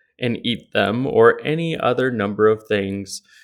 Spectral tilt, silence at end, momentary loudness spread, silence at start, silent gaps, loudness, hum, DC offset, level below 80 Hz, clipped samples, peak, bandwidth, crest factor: -5.5 dB/octave; 0.25 s; 10 LU; 0.2 s; none; -19 LUFS; none; under 0.1%; -60 dBFS; under 0.1%; 0 dBFS; 12.5 kHz; 20 dB